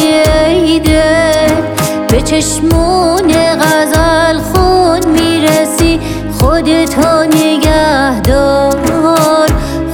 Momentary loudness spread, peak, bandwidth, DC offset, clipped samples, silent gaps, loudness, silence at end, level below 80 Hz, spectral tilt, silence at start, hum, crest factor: 3 LU; 0 dBFS; 18 kHz; under 0.1%; under 0.1%; none; -9 LUFS; 0 s; -20 dBFS; -5 dB/octave; 0 s; none; 8 dB